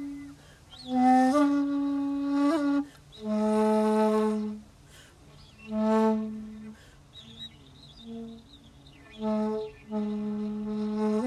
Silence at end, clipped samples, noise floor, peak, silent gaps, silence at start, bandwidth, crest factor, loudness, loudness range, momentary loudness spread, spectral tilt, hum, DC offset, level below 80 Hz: 0 s; under 0.1%; -53 dBFS; -12 dBFS; none; 0 s; 12 kHz; 16 dB; -27 LUFS; 11 LU; 21 LU; -6.5 dB/octave; none; under 0.1%; -60 dBFS